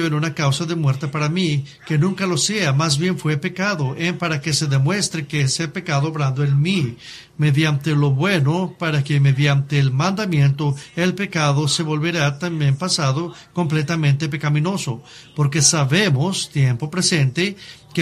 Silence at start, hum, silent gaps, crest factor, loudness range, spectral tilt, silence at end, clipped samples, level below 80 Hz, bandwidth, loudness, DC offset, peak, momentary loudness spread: 0 s; none; none; 18 dB; 2 LU; -4.5 dB/octave; 0 s; under 0.1%; -54 dBFS; 13.5 kHz; -19 LUFS; under 0.1%; -2 dBFS; 6 LU